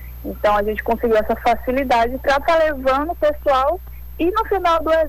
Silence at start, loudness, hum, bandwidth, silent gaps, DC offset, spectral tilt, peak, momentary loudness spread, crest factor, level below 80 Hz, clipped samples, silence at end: 0 s; -18 LUFS; none; 19 kHz; none; under 0.1%; -5.5 dB/octave; -10 dBFS; 5 LU; 10 dB; -34 dBFS; under 0.1%; 0 s